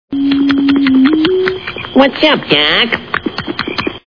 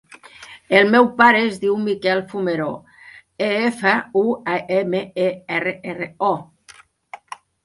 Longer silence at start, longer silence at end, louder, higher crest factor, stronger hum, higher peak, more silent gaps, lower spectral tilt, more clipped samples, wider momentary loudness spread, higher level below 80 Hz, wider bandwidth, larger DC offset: second, 0.1 s vs 0.4 s; second, 0.1 s vs 0.5 s; first, -12 LUFS vs -19 LUFS; second, 12 dB vs 20 dB; neither; about the same, 0 dBFS vs 0 dBFS; neither; about the same, -6 dB/octave vs -5.5 dB/octave; first, 0.2% vs under 0.1%; second, 9 LU vs 16 LU; first, -44 dBFS vs -64 dBFS; second, 5.4 kHz vs 11.5 kHz; first, 0.5% vs under 0.1%